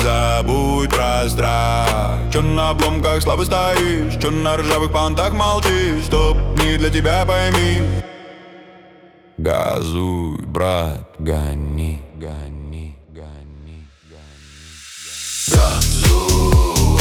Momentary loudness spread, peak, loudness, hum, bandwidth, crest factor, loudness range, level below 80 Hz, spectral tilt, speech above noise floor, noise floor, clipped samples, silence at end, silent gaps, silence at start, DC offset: 17 LU; 0 dBFS; -17 LUFS; none; 20 kHz; 16 dB; 10 LU; -24 dBFS; -5 dB/octave; 30 dB; -46 dBFS; under 0.1%; 0 s; none; 0 s; under 0.1%